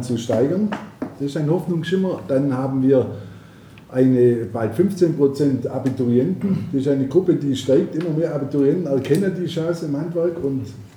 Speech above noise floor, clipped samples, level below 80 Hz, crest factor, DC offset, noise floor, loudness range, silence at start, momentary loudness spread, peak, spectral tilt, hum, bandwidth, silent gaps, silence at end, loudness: 24 dB; under 0.1%; -58 dBFS; 16 dB; under 0.1%; -43 dBFS; 2 LU; 0 s; 7 LU; -4 dBFS; -8 dB/octave; none; 15 kHz; none; 0.1 s; -20 LUFS